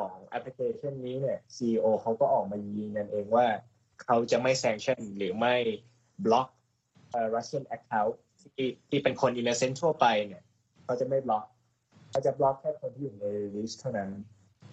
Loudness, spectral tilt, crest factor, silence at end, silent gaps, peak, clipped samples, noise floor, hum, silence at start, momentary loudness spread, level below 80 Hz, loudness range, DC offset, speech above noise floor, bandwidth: -30 LUFS; -5 dB/octave; 20 dB; 0 s; none; -10 dBFS; under 0.1%; -64 dBFS; none; 0 s; 11 LU; -72 dBFS; 4 LU; under 0.1%; 35 dB; 8.4 kHz